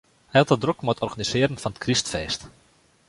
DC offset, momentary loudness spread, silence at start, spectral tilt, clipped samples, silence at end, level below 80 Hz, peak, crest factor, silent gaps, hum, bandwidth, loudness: under 0.1%; 9 LU; 0.35 s; -4.5 dB/octave; under 0.1%; 0.6 s; -50 dBFS; -2 dBFS; 22 dB; none; none; 11.5 kHz; -24 LUFS